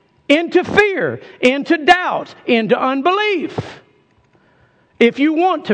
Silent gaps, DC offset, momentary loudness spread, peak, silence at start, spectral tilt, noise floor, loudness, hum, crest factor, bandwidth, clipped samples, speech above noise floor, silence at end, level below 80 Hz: none; under 0.1%; 10 LU; 0 dBFS; 0.3 s; -5 dB/octave; -55 dBFS; -15 LUFS; none; 16 dB; 9.4 kHz; under 0.1%; 40 dB; 0 s; -54 dBFS